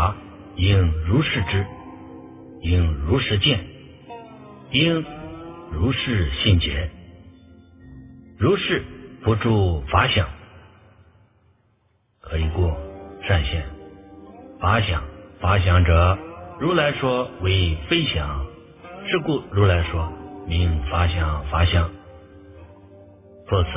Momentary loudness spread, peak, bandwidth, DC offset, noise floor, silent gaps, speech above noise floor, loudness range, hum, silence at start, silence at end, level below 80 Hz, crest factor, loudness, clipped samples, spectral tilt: 21 LU; -2 dBFS; 3.8 kHz; under 0.1%; -64 dBFS; none; 44 dB; 5 LU; none; 0 s; 0 s; -30 dBFS; 20 dB; -21 LUFS; under 0.1%; -10.5 dB/octave